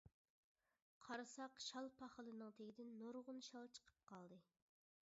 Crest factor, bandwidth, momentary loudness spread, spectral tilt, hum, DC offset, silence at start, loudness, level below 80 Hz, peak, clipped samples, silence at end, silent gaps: 20 dB; 7.6 kHz; 12 LU; -2.5 dB/octave; none; under 0.1%; 0.05 s; -56 LUFS; -90 dBFS; -38 dBFS; under 0.1%; 0.65 s; 0.14-0.55 s, 0.82-1.01 s